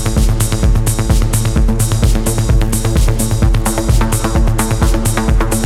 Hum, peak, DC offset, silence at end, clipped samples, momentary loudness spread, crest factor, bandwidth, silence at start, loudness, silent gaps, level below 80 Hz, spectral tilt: none; 0 dBFS; under 0.1%; 0 s; under 0.1%; 1 LU; 10 dB; 16 kHz; 0 s; -14 LUFS; none; -14 dBFS; -5.5 dB/octave